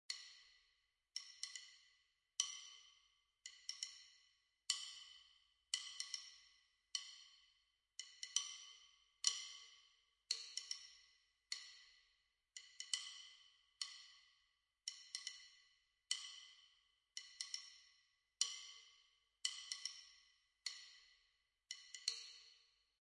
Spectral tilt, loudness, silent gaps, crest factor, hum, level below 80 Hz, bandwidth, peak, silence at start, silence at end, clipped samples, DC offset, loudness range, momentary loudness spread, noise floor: 6.5 dB/octave; -47 LUFS; none; 34 dB; none; under -90 dBFS; 12 kHz; -20 dBFS; 0.1 s; 0.4 s; under 0.1%; under 0.1%; 5 LU; 21 LU; -83 dBFS